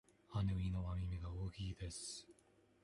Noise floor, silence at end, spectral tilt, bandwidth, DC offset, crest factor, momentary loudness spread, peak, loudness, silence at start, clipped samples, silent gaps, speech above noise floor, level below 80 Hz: -72 dBFS; 0.5 s; -5.5 dB/octave; 11.5 kHz; under 0.1%; 14 dB; 8 LU; -30 dBFS; -45 LUFS; 0.3 s; under 0.1%; none; 29 dB; -52 dBFS